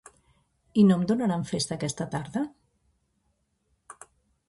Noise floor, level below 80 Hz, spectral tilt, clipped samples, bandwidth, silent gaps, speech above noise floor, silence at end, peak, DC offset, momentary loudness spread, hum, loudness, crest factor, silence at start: -74 dBFS; -62 dBFS; -6 dB/octave; under 0.1%; 11.5 kHz; none; 49 dB; 0.55 s; -10 dBFS; under 0.1%; 12 LU; none; -26 LUFS; 20 dB; 0.75 s